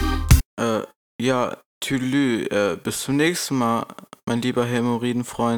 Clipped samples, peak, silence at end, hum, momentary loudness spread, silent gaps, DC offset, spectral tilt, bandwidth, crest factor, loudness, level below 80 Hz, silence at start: under 0.1%; -4 dBFS; 0 s; none; 9 LU; 0.45-0.57 s, 0.96-1.19 s, 1.66-1.81 s, 4.23-4.27 s; under 0.1%; -5 dB/octave; over 20 kHz; 18 dB; -22 LUFS; -30 dBFS; 0 s